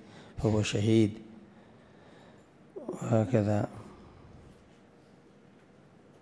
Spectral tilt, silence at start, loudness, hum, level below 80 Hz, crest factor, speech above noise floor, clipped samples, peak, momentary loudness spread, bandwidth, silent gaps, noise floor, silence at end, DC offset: -7 dB/octave; 0.15 s; -29 LUFS; none; -60 dBFS; 22 dB; 31 dB; under 0.1%; -12 dBFS; 26 LU; 10.5 kHz; none; -58 dBFS; 2.15 s; under 0.1%